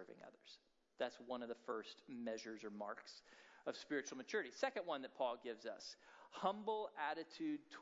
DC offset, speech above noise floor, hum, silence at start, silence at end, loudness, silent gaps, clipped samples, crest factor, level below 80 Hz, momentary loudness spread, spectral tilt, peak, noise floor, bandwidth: under 0.1%; 22 dB; none; 0 s; 0 s; -47 LUFS; none; under 0.1%; 22 dB; under -90 dBFS; 17 LU; -2 dB/octave; -24 dBFS; -68 dBFS; 7.6 kHz